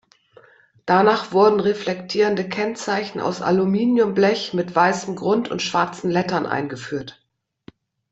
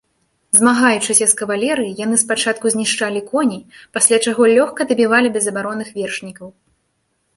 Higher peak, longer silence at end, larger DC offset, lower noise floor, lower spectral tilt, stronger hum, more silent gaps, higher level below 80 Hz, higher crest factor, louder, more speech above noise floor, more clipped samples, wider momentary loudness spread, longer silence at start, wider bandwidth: about the same, -2 dBFS vs 0 dBFS; first, 1 s vs 0.85 s; neither; second, -52 dBFS vs -67 dBFS; first, -5.5 dB/octave vs -2 dB/octave; neither; neither; about the same, -62 dBFS vs -62 dBFS; about the same, 18 dB vs 18 dB; second, -20 LUFS vs -15 LUFS; second, 32 dB vs 51 dB; neither; about the same, 9 LU vs 11 LU; first, 0.85 s vs 0.55 s; second, 8.2 kHz vs 13 kHz